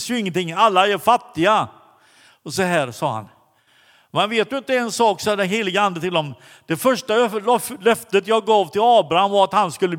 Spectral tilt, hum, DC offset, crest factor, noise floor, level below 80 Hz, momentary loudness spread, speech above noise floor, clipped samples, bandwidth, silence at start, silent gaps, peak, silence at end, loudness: -4 dB/octave; none; under 0.1%; 18 dB; -57 dBFS; -64 dBFS; 9 LU; 38 dB; under 0.1%; 18 kHz; 0 s; none; -2 dBFS; 0 s; -19 LUFS